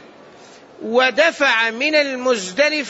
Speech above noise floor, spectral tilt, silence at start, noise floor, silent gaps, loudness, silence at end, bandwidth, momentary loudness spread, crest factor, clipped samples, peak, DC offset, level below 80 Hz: 26 dB; -2 dB/octave; 0.8 s; -43 dBFS; none; -16 LUFS; 0 s; 8 kHz; 6 LU; 16 dB; under 0.1%; -4 dBFS; under 0.1%; -66 dBFS